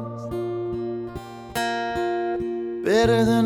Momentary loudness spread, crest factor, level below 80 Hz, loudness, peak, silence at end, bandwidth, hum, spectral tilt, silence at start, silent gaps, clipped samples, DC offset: 13 LU; 16 dB; -46 dBFS; -25 LUFS; -8 dBFS; 0 s; 19.5 kHz; none; -6 dB/octave; 0 s; none; under 0.1%; under 0.1%